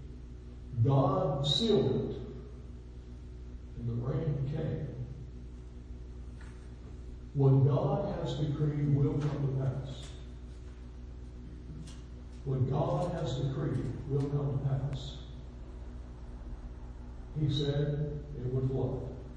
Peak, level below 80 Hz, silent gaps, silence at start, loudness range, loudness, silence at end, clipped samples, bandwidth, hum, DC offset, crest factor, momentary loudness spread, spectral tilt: -16 dBFS; -46 dBFS; none; 0 s; 8 LU; -32 LUFS; 0 s; under 0.1%; 9.2 kHz; 60 Hz at -45 dBFS; under 0.1%; 18 dB; 20 LU; -8 dB/octave